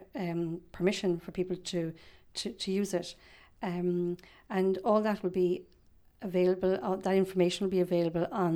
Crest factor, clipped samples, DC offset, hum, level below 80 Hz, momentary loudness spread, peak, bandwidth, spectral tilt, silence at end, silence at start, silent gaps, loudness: 18 dB; under 0.1%; under 0.1%; none; -62 dBFS; 10 LU; -14 dBFS; 14 kHz; -6 dB/octave; 0 s; 0 s; none; -32 LUFS